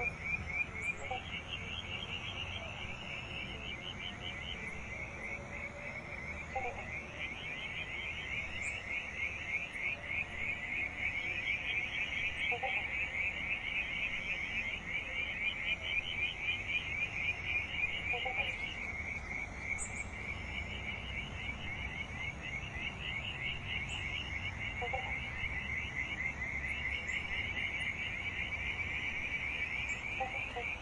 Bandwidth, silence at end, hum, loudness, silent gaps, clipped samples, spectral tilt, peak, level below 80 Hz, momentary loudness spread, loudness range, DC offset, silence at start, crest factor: 11.5 kHz; 0 s; none; -37 LUFS; none; under 0.1%; -3.5 dB/octave; -24 dBFS; -52 dBFS; 7 LU; 6 LU; under 0.1%; 0 s; 16 dB